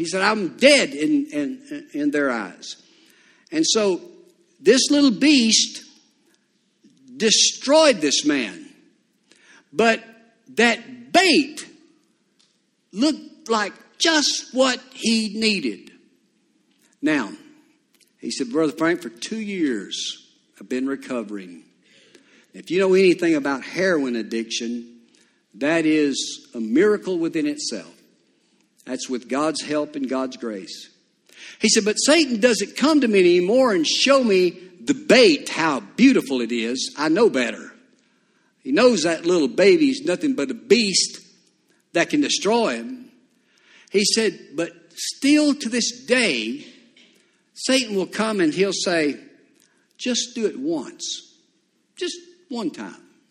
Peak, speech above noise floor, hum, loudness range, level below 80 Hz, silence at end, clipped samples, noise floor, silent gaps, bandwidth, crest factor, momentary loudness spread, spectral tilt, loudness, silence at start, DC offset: 0 dBFS; 46 dB; none; 9 LU; -68 dBFS; 0.35 s; under 0.1%; -66 dBFS; none; 13.5 kHz; 22 dB; 15 LU; -3 dB/octave; -20 LUFS; 0 s; under 0.1%